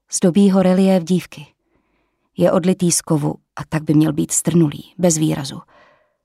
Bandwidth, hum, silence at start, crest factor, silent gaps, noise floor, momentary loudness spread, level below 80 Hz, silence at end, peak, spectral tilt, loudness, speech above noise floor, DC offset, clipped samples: 15 kHz; none; 0.1 s; 14 dB; none; -66 dBFS; 13 LU; -54 dBFS; 0.65 s; -4 dBFS; -5.5 dB/octave; -17 LUFS; 50 dB; under 0.1%; under 0.1%